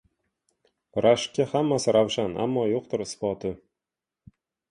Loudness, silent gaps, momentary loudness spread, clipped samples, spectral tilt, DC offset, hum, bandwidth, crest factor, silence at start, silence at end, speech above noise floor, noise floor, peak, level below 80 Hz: -25 LUFS; none; 11 LU; under 0.1%; -5 dB/octave; under 0.1%; none; 11.5 kHz; 20 dB; 0.95 s; 1.15 s; 64 dB; -88 dBFS; -8 dBFS; -60 dBFS